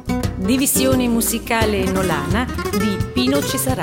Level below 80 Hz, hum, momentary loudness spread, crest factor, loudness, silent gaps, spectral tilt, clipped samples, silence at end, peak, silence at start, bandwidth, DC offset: -32 dBFS; none; 5 LU; 16 dB; -18 LUFS; none; -4.5 dB/octave; under 0.1%; 0 s; -2 dBFS; 0 s; 16.5 kHz; under 0.1%